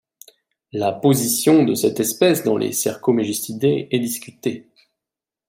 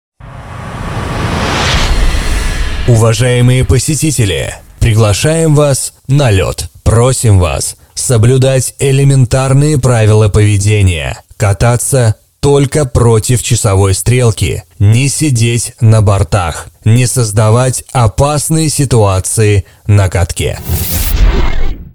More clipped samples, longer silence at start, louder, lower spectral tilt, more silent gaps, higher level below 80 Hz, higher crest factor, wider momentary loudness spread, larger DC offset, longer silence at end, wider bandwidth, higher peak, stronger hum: neither; first, 0.75 s vs 0.25 s; second, -19 LUFS vs -10 LUFS; about the same, -4.5 dB/octave vs -5 dB/octave; neither; second, -64 dBFS vs -20 dBFS; first, 18 dB vs 10 dB; first, 12 LU vs 8 LU; second, under 0.1% vs 1%; first, 0.9 s vs 0.05 s; second, 16.5 kHz vs over 20 kHz; about the same, -2 dBFS vs 0 dBFS; neither